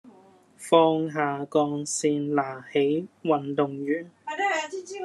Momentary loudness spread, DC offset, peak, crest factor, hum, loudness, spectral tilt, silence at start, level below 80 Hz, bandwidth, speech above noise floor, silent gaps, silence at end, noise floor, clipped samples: 9 LU; under 0.1%; -4 dBFS; 22 dB; none; -26 LUFS; -4.5 dB/octave; 0.05 s; -80 dBFS; 12.5 kHz; 30 dB; none; 0 s; -55 dBFS; under 0.1%